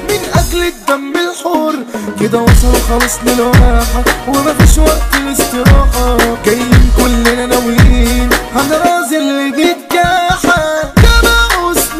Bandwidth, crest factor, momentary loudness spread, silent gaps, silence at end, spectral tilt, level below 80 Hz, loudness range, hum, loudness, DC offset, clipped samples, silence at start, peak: 16 kHz; 10 dB; 6 LU; none; 0 s; -4.5 dB/octave; -14 dBFS; 1 LU; none; -10 LUFS; under 0.1%; 0.2%; 0 s; 0 dBFS